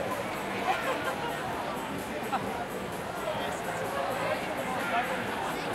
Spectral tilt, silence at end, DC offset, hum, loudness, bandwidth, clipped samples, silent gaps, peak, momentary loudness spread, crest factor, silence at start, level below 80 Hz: -4 dB/octave; 0 s; under 0.1%; none; -32 LUFS; 16 kHz; under 0.1%; none; -16 dBFS; 5 LU; 16 dB; 0 s; -58 dBFS